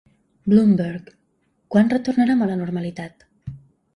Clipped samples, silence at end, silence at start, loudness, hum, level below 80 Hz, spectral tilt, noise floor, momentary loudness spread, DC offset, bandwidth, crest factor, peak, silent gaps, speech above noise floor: under 0.1%; 0.4 s; 0.45 s; -20 LUFS; none; -56 dBFS; -8.5 dB/octave; -66 dBFS; 22 LU; under 0.1%; 10.5 kHz; 18 dB; -4 dBFS; none; 48 dB